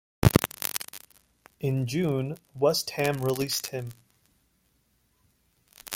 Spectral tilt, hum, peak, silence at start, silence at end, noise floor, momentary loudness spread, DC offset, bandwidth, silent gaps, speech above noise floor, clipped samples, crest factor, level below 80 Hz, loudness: -5 dB/octave; none; -2 dBFS; 0.2 s; 0 s; -69 dBFS; 16 LU; under 0.1%; 17 kHz; none; 42 dB; under 0.1%; 28 dB; -48 dBFS; -28 LUFS